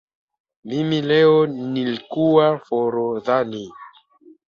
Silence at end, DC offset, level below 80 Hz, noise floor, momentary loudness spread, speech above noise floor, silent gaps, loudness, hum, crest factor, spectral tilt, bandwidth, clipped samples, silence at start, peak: 0.6 s; under 0.1%; -64 dBFS; -51 dBFS; 12 LU; 32 dB; none; -19 LUFS; none; 16 dB; -7.5 dB/octave; 6.8 kHz; under 0.1%; 0.65 s; -4 dBFS